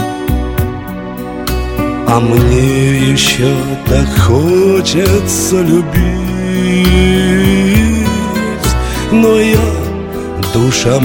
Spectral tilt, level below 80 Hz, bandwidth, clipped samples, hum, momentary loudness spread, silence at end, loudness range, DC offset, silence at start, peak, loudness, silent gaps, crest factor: -5.5 dB/octave; -20 dBFS; 17.5 kHz; 0.4%; none; 9 LU; 0 s; 2 LU; under 0.1%; 0 s; 0 dBFS; -11 LUFS; none; 10 dB